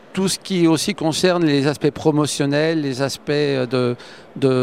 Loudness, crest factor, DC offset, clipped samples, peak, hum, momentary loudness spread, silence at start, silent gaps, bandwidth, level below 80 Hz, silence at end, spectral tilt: -19 LUFS; 18 dB; 0.2%; under 0.1%; -2 dBFS; none; 5 LU; 0.15 s; none; 16 kHz; -56 dBFS; 0 s; -5 dB/octave